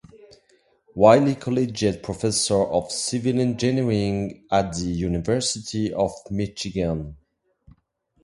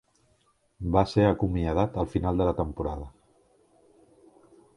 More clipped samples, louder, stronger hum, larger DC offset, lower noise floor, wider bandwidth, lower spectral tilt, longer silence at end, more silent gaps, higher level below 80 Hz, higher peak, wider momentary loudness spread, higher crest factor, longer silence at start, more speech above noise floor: neither; first, -23 LUFS vs -27 LUFS; neither; neither; about the same, -66 dBFS vs -68 dBFS; about the same, 11.5 kHz vs 11 kHz; second, -5 dB/octave vs -8.5 dB/octave; second, 1.1 s vs 1.65 s; neither; second, -46 dBFS vs -40 dBFS; first, -2 dBFS vs -6 dBFS; second, 9 LU vs 12 LU; about the same, 22 dB vs 22 dB; first, 0.95 s vs 0.8 s; about the same, 44 dB vs 42 dB